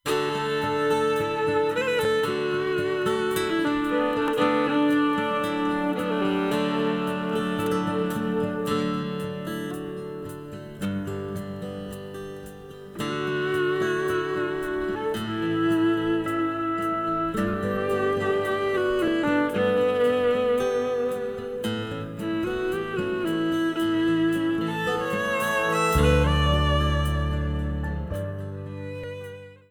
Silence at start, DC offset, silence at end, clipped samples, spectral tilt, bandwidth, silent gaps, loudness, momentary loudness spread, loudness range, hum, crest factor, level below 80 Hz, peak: 0.05 s; under 0.1%; 0.15 s; under 0.1%; -6 dB/octave; 19.5 kHz; none; -25 LUFS; 12 LU; 6 LU; none; 16 dB; -38 dBFS; -8 dBFS